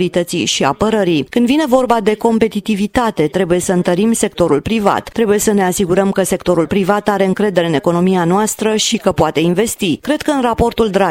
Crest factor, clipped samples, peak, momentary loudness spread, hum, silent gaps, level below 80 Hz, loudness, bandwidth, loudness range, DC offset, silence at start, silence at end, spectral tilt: 14 dB; under 0.1%; 0 dBFS; 3 LU; none; none; -40 dBFS; -14 LUFS; 16.5 kHz; 0 LU; under 0.1%; 0 s; 0 s; -5 dB/octave